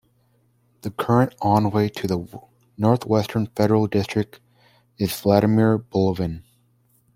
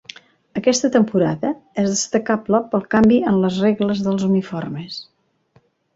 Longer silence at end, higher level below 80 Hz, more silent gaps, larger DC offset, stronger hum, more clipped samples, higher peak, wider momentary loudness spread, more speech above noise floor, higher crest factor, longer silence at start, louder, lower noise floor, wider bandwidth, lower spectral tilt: second, 0.75 s vs 0.9 s; about the same, -54 dBFS vs -54 dBFS; neither; neither; neither; neither; about the same, -2 dBFS vs -2 dBFS; about the same, 11 LU vs 13 LU; about the same, 42 dB vs 41 dB; about the same, 20 dB vs 16 dB; first, 0.85 s vs 0.55 s; second, -21 LUFS vs -18 LUFS; first, -63 dBFS vs -58 dBFS; first, 16.5 kHz vs 8 kHz; first, -7.5 dB/octave vs -5.5 dB/octave